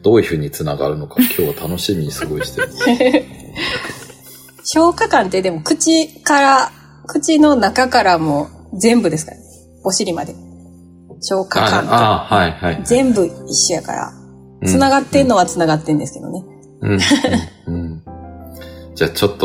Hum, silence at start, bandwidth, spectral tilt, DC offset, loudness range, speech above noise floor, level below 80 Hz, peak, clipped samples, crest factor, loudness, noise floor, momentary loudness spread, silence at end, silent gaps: none; 0.05 s; 16.5 kHz; -4 dB/octave; under 0.1%; 5 LU; 26 dB; -46 dBFS; 0 dBFS; under 0.1%; 14 dB; -15 LUFS; -41 dBFS; 16 LU; 0 s; none